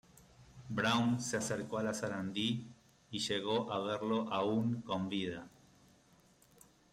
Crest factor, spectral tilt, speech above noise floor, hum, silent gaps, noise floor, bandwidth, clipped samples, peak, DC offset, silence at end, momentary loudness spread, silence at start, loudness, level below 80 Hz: 16 dB; -4.5 dB/octave; 31 dB; none; none; -66 dBFS; 15 kHz; under 0.1%; -22 dBFS; under 0.1%; 1.45 s; 10 LU; 0.4 s; -36 LUFS; -70 dBFS